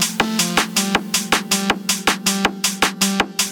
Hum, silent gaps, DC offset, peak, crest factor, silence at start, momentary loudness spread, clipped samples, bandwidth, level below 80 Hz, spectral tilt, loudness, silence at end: none; none; under 0.1%; -2 dBFS; 18 dB; 0 s; 2 LU; under 0.1%; over 20 kHz; -48 dBFS; -2 dB/octave; -18 LUFS; 0 s